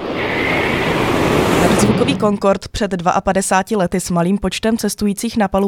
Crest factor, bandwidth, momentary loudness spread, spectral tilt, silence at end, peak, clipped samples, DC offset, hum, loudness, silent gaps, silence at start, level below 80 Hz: 16 dB; 18 kHz; 5 LU; -5 dB/octave; 0 s; 0 dBFS; under 0.1%; under 0.1%; none; -16 LUFS; none; 0 s; -36 dBFS